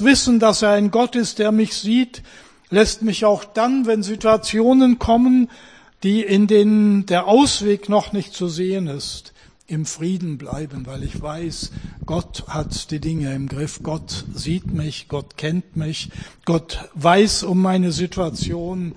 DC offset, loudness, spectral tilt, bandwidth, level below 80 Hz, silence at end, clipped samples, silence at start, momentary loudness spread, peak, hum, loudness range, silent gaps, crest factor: 0.1%; -19 LUFS; -5 dB/octave; 10.5 kHz; -40 dBFS; 0.05 s; under 0.1%; 0 s; 15 LU; 0 dBFS; none; 11 LU; none; 18 dB